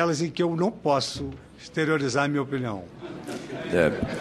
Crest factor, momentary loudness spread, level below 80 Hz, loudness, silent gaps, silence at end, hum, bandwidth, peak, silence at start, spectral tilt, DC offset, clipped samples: 20 dB; 13 LU; -52 dBFS; -26 LUFS; none; 0 s; none; 13 kHz; -6 dBFS; 0 s; -5.5 dB/octave; under 0.1%; under 0.1%